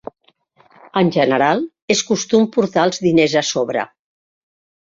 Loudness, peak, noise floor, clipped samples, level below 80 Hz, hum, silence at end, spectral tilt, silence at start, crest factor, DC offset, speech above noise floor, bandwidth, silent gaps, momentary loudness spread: -17 LUFS; -2 dBFS; -59 dBFS; under 0.1%; -58 dBFS; none; 1 s; -4.5 dB/octave; 0.95 s; 16 dB; under 0.1%; 43 dB; 7.8 kHz; 1.82-1.88 s; 8 LU